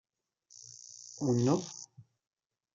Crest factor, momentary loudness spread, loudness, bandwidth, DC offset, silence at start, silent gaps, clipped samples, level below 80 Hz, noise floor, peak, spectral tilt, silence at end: 20 dB; 22 LU; -32 LUFS; 9 kHz; under 0.1%; 1 s; none; under 0.1%; -74 dBFS; -68 dBFS; -16 dBFS; -6.5 dB/octave; 0.75 s